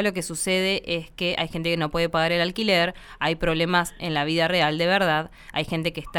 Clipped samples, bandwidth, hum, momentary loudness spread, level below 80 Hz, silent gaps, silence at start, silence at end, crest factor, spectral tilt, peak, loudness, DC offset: under 0.1%; 18 kHz; none; 6 LU; -44 dBFS; none; 0 s; 0 s; 18 dB; -4 dB/octave; -6 dBFS; -23 LUFS; under 0.1%